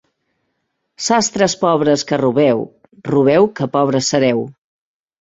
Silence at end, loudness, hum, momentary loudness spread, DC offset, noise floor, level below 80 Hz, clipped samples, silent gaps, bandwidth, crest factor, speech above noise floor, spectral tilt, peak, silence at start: 0.7 s; -15 LUFS; none; 9 LU; under 0.1%; -71 dBFS; -56 dBFS; under 0.1%; none; 8 kHz; 16 dB; 56 dB; -4.5 dB/octave; -2 dBFS; 1 s